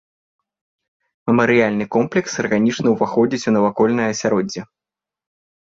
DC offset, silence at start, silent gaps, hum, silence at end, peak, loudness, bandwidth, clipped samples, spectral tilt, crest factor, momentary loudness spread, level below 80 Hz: under 0.1%; 1.25 s; none; none; 1.05 s; -4 dBFS; -18 LUFS; 7.6 kHz; under 0.1%; -5.5 dB/octave; 16 dB; 6 LU; -56 dBFS